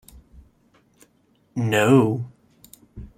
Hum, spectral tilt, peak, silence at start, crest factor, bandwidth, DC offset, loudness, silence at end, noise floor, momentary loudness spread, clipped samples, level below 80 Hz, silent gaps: none; -6.5 dB/octave; -2 dBFS; 1.55 s; 22 dB; 16 kHz; under 0.1%; -20 LUFS; 0.1 s; -62 dBFS; 21 LU; under 0.1%; -52 dBFS; none